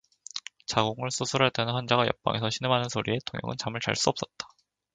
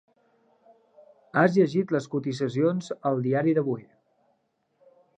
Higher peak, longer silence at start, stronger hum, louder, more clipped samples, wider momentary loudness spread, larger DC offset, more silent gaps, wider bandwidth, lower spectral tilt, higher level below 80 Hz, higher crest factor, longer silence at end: about the same, -6 dBFS vs -6 dBFS; second, 0.35 s vs 1.35 s; neither; second, -28 LUFS vs -25 LUFS; neither; first, 13 LU vs 8 LU; neither; neither; about the same, 9.6 kHz vs 9.2 kHz; second, -4 dB/octave vs -7.5 dB/octave; first, -60 dBFS vs -76 dBFS; about the same, 24 dB vs 20 dB; second, 0.45 s vs 1.35 s